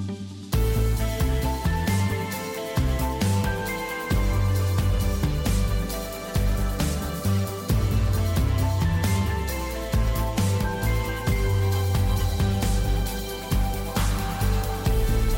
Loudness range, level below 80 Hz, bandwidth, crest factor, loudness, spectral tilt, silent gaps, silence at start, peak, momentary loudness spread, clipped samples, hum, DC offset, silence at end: 1 LU; -28 dBFS; 17 kHz; 10 dB; -25 LUFS; -5.5 dB/octave; none; 0 s; -12 dBFS; 5 LU; under 0.1%; none; under 0.1%; 0 s